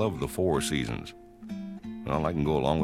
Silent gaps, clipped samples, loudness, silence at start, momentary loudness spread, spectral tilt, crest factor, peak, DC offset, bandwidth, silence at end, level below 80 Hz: none; under 0.1%; -30 LUFS; 0 s; 14 LU; -5.5 dB/octave; 18 dB; -12 dBFS; under 0.1%; 16 kHz; 0 s; -46 dBFS